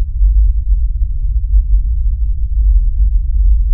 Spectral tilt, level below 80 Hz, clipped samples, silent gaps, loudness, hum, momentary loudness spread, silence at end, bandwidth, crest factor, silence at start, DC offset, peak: -26.5 dB/octave; -12 dBFS; under 0.1%; none; -16 LUFS; none; 5 LU; 0 s; 0.2 kHz; 10 dB; 0 s; under 0.1%; -2 dBFS